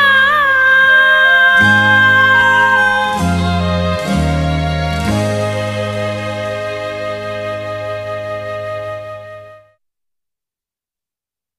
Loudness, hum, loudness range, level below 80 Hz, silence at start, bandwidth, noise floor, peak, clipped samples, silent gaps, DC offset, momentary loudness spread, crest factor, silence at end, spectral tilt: -12 LUFS; none; 17 LU; -32 dBFS; 0 s; 15 kHz; -89 dBFS; 0 dBFS; under 0.1%; none; under 0.1%; 15 LU; 14 dB; 2 s; -5 dB/octave